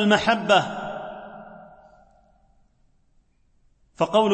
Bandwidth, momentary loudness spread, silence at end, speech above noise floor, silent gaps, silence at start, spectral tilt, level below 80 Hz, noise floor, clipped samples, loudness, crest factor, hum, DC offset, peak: 8.8 kHz; 23 LU; 0 s; 43 dB; none; 0 s; -4.5 dB/octave; -58 dBFS; -62 dBFS; under 0.1%; -22 LUFS; 20 dB; none; under 0.1%; -6 dBFS